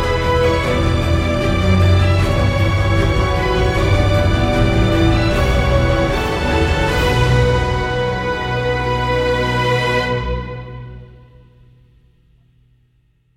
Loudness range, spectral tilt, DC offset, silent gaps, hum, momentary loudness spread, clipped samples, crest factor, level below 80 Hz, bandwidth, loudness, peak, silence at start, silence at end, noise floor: 6 LU; -6.5 dB/octave; under 0.1%; none; none; 5 LU; under 0.1%; 14 dB; -24 dBFS; 15.5 kHz; -16 LUFS; -2 dBFS; 0 s; 2.3 s; -58 dBFS